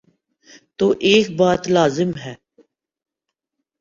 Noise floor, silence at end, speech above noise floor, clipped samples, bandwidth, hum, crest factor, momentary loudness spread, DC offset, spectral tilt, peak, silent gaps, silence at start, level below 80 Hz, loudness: -82 dBFS; 1.45 s; 65 dB; under 0.1%; 7.8 kHz; none; 18 dB; 11 LU; under 0.1%; -5 dB/octave; -4 dBFS; none; 0.8 s; -54 dBFS; -17 LUFS